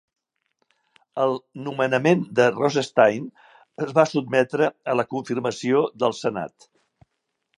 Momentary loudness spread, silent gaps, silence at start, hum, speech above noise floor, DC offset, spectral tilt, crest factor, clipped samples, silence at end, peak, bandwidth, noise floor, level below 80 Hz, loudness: 13 LU; none; 1.15 s; none; 56 dB; under 0.1%; -5.5 dB/octave; 22 dB; under 0.1%; 1.1 s; -2 dBFS; 11.5 kHz; -78 dBFS; -70 dBFS; -22 LUFS